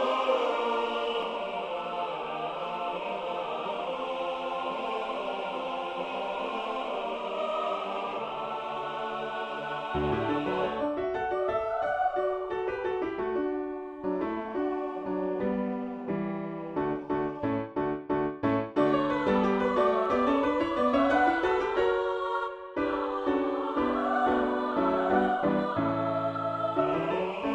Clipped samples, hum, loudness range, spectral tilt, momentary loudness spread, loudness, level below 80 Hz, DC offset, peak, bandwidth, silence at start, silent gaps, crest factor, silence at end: under 0.1%; none; 7 LU; -7 dB/octave; 8 LU; -30 LUFS; -56 dBFS; under 0.1%; -12 dBFS; 8.8 kHz; 0 s; none; 16 dB; 0 s